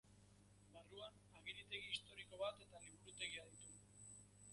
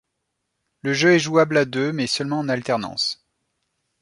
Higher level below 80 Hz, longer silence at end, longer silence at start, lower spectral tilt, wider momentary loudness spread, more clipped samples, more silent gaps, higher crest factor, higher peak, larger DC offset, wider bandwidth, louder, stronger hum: second, -78 dBFS vs -64 dBFS; second, 0 s vs 0.85 s; second, 0.05 s vs 0.85 s; second, -1.5 dB/octave vs -4.5 dB/octave; first, 12 LU vs 8 LU; neither; neither; about the same, 24 dB vs 20 dB; second, -32 dBFS vs -4 dBFS; neither; about the same, 11.5 kHz vs 11.5 kHz; second, -53 LUFS vs -21 LUFS; first, 50 Hz at -70 dBFS vs none